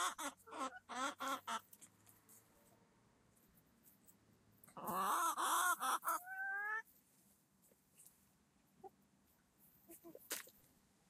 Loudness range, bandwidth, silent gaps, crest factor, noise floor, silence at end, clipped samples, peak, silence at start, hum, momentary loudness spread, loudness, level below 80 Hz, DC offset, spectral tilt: 15 LU; 15.5 kHz; none; 22 dB; -75 dBFS; 0.6 s; under 0.1%; -24 dBFS; 0 s; none; 25 LU; -42 LUFS; -88 dBFS; under 0.1%; -0.5 dB/octave